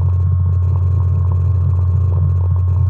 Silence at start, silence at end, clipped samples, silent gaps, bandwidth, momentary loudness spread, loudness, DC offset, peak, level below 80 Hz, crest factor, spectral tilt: 0 s; 0 s; under 0.1%; none; 1.6 kHz; 0 LU; -16 LUFS; under 0.1%; -6 dBFS; -36 dBFS; 8 dB; -11.5 dB/octave